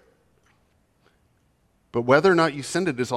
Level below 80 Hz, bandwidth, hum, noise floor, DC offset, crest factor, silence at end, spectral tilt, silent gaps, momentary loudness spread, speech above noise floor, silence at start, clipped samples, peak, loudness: -64 dBFS; 13 kHz; none; -65 dBFS; under 0.1%; 22 dB; 0 s; -5.5 dB/octave; none; 11 LU; 45 dB; 1.95 s; under 0.1%; -4 dBFS; -21 LUFS